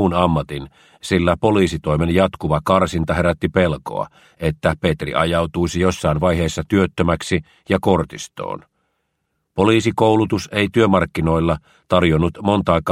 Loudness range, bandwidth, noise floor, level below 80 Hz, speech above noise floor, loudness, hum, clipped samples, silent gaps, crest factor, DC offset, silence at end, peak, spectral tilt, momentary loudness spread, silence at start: 3 LU; 14.5 kHz; -72 dBFS; -36 dBFS; 54 dB; -18 LUFS; none; under 0.1%; none; 18 dB; under 0.1%; 0 s; 0 dBFS; -6.5 dB/octave; 11 LU; 0 s